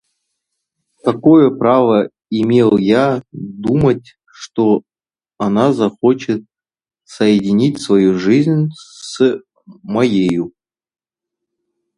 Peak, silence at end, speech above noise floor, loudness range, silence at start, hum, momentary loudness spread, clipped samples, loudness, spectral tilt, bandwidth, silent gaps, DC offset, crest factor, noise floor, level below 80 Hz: 0 dBFS; 1.5 s; 68 dB; 4 LU; 1.05 s; none; 11 LU; under 0.1%; -14 LUFS; -7 dB/octave; 11 kHz; none; under 0.1%; 16 dB; -82 dBFS; -50 dBFS